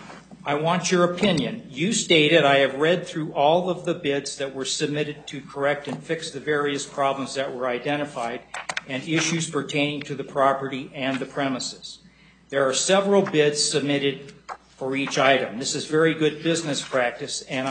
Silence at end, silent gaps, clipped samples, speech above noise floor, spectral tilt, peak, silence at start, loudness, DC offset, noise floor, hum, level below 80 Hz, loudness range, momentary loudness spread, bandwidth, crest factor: 0 s; none; under 0.1%; 30 dB; -3.5 dB/octave; -4 dBFS; 0 s; -23 LUFS; under 0.1%; -53 dBFS; none; -64 dBFS; 6 LU; 12 LU; 9.4 kHz; 20 dB